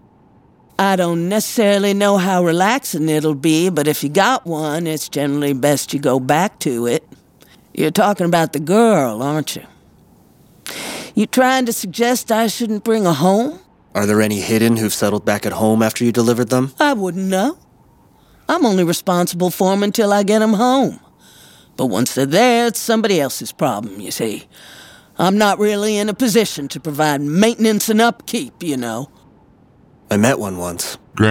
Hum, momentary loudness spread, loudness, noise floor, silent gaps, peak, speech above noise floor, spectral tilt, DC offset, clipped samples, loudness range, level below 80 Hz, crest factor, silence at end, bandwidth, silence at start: none; 10 LU; -16 LUFS; -50 dBFS; none; 0 dBFS; 34 dB; -4.5 dB/octave; under 0.1%; under 0.1%; 3 LU; -58 dBFS; 16 dB; 0 s; 17 kHz; 0.8 s